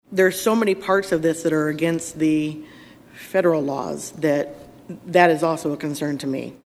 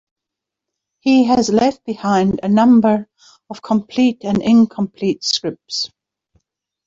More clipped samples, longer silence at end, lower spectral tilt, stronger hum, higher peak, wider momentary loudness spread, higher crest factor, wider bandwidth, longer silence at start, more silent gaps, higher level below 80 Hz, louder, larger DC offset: neither; second, 0.1 s vs 1 s; about the same, -5.5 dB/octave vs -5.5 dB/octave; neither; about the same, -2 dBFS vs -2 dBFS; about the same, 12 LU vs 11 LU; first, 20 dB vs 14 dB; first, 14.5 kHz vs 7.8 kHz; second, 0.1 s vs 1.05 s; neither; second, -60 dBFS vs -54 dBFS; second, -21 LUFS vs -16 LUFS; neither